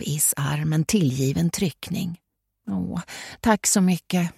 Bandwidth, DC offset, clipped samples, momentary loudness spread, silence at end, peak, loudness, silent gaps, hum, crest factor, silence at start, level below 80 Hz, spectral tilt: 16.5 kHz; under 0.1%; under 0.1%; 13 LU; 0.05 s; -4 dBFS; -23 LUFS; none; none; 20 dB; 0 s; -52 dBFS; -4.5 dB/octave